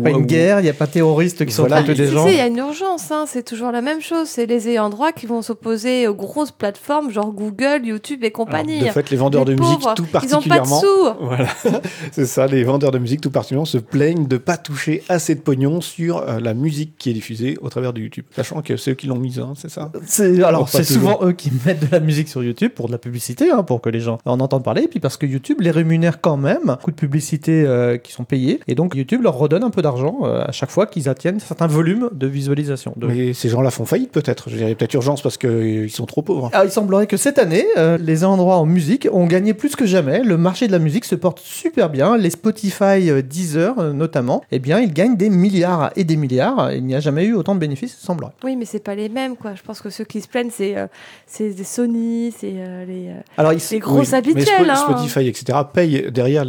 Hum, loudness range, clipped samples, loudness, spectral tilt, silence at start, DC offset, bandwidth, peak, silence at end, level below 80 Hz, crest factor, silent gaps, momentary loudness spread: none; 6 LU; under 0.1%; -17 LUFS; -6 dB/octave; 0 s; under 0.1%; over 20 kHz; 0 dBFS; 0 s; -64 dBFS; 16 dB; none; 10 LU